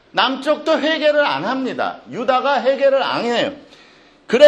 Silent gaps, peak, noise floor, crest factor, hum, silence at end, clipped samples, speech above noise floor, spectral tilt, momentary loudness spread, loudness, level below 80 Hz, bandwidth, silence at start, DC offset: none; 0 dBFS; -48 dBFS; 16 dB; none; 0 s; 0.1%; 31 dB; -4 dB/octave; 8 LU; -18 LUFS; -64 dBFS; 9.2 kHz; 0.15 s; under 0.1%